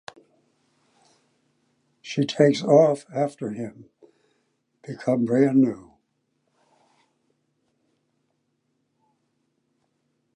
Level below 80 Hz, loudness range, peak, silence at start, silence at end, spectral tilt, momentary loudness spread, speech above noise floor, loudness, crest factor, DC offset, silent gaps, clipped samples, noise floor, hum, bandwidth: -74 dBFS; 3 LU; -4 dBFS; 2.05 s; 4.55 s; -7 dB/octave; 22 LU; 52 dB; -22 LUFS; 24 dB; under 0.1%; none; under 0.1%; -73 dBFS; none; 10.5 kHz